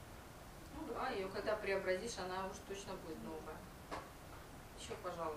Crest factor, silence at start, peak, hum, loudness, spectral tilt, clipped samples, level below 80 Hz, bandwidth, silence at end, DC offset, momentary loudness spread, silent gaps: 18 dB; 0 s; -26 dBFS; none; -45 LUFS; -4 dB/octave; under 0.1%; -60 dBFS; 15.5 kHz; 0 s; under 0.1%; 16 LU; none